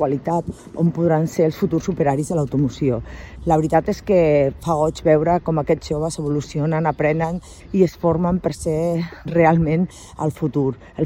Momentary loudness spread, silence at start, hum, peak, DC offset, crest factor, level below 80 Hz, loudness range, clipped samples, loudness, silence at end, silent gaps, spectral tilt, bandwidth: 8 LU; 0 s; none; -2 dBFS; under 0.1%; 16 dB; -40 dBFS; 2 LU; under 0.1%; -20 LUFS; 0 s; none; -7.5 dB/octave; 16 kHz